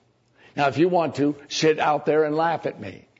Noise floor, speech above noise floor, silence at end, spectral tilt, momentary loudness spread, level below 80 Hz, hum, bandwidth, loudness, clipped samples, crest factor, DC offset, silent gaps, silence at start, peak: -57 dBFS; 35 dB; 0.25 s; -5 dB/octave; 10 LU; -68 dBFS; none; 8 kHz; -22 LUFS; under 0.1%; 16 dB; under 0.1%; none; 0.55 s; -8 dBFS